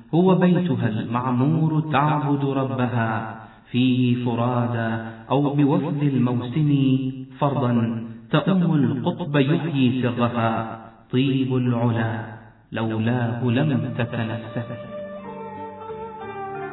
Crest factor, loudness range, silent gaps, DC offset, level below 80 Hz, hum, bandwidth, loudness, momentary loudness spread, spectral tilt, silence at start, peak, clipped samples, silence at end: 16 dB; 4 LU; none; under 0.1%; -58 dBFS; none; 4.1 kHz; -22 LUFS; 14 LU; -11.5 dB/octave; 0 s; -6 dBFS; under 0.1%; 0 s